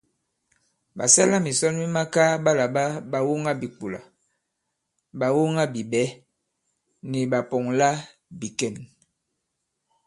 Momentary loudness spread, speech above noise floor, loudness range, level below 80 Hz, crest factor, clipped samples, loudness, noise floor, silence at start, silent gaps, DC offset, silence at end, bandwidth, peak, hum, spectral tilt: 17 LU; 56 dB; 6 LU; -68 dBFS; 22 dB; under 0.1%; -23 LUFS; -79 dBFS; 0.95 s; none; under 0.1%; 1.2 s; 11.5 kHz; -2 dBFS; none; -4 dB/octave